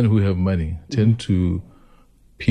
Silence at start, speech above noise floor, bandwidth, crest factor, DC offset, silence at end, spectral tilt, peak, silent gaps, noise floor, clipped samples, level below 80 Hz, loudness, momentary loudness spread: 0 s; 33 dB; 9.8 kHz; 16 dB; under 0.1%; 0 s; -8 dB/octave; -4 dBFS; none; -52 dBFS; under 0.1%; -38 dBFS; -21 LUFS; 7 LU